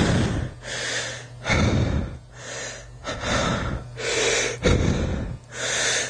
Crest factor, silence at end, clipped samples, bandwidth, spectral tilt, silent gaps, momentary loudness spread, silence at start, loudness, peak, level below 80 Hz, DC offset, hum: 18 dB; 0 s; under 0.1%; 11 kHz; -4 dB/octave; none; 12 LU; 0 s; -25 LUFS; -6 dBFS; -34 dBFS; under 0.1%; none